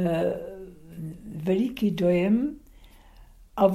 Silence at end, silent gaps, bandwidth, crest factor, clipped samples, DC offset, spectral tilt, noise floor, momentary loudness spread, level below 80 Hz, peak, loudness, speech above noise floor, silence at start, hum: 0 s; none; 15.5 kHz; 18 dB; under 0.1%; under 0.1%; -8 dB/octave; -51 dBFS; 18 LU; -52 dBFS; -8 dBFS; -26 LUFS; 27 dB; 0 s; none